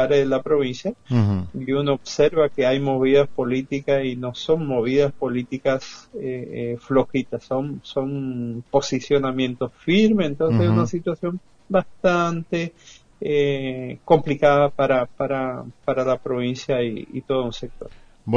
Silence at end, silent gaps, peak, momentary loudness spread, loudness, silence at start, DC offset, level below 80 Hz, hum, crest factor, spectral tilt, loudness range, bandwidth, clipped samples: 0 s; none; -2 dBFS; 11 LU; -22 LUFS; 0 s; under 0.1%; -50 dBFS; none; 18 dB; -6.5 dB/octave; 4 LU; 7.4 kHz; under 0.1%